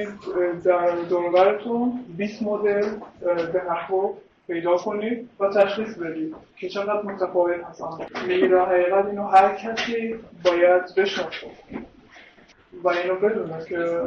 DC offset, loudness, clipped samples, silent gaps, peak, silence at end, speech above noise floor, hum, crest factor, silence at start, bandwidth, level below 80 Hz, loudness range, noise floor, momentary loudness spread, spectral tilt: under 0.1%; -23 LUFS; under 0.1%; none; -6 dBFS; 0 s; 30 dB; none; 18 dB; 0 s; 7 kHz; -62 dBFS; 5 LU; -52 dBFS; 13 LU; -5.5 dB/octave